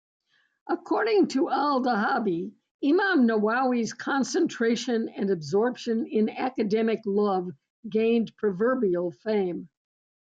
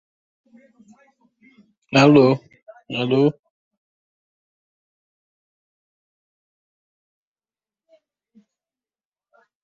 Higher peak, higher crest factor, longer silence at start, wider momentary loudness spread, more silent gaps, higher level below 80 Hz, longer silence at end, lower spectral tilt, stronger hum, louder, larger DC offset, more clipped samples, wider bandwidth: second, -14 dBFS vs -2 dBFS; second, 12 dB vs 22 dB; second, 0.65 s vs 1.9 s; second, 8 LU vs 13 LU; first, 2.71-2.79 s, 7.70-7.83 s vs 2.62-2.66 s; second, -76 dBFS vs -62 dBFS; second, 0.6 s vs 6.35 s; about the same, -5.5 dB/octave vs -6.5 dB/octave; neither; second, -26 LUFS vs -17 LUFS; neither; neither; about the same, 8 kHz vs 7.8 kHz